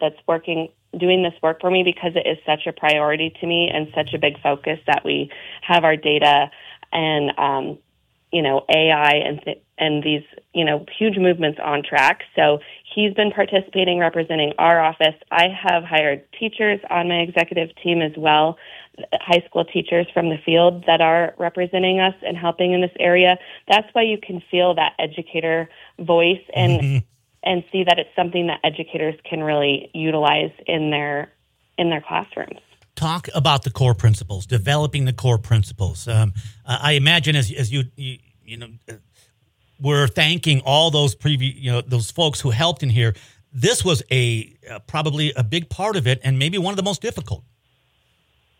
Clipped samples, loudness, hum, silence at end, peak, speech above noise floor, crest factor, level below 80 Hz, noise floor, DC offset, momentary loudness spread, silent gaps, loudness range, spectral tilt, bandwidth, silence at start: under 0.1%; -19 LUFS; none; 1.2 s; -2 dBFS; 44 dB; 18 dB; -50 dBFS; -64 dBFS; under 0.1%; 11 LU; none; 3 LU; -5 dB/octave; 16 kHz; 0 s